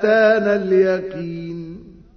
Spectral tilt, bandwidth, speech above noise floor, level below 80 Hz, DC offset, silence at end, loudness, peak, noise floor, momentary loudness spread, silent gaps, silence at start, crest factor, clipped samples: -7.5 dB/octave; 6.4 kHz; 21 dB; -52 dBFS; under 0.1%; 0.25 s; -17 LUFS; -2 dBFS; -38 dBFS; 17 LU; none; 0 s; 16 dB; under 0.1%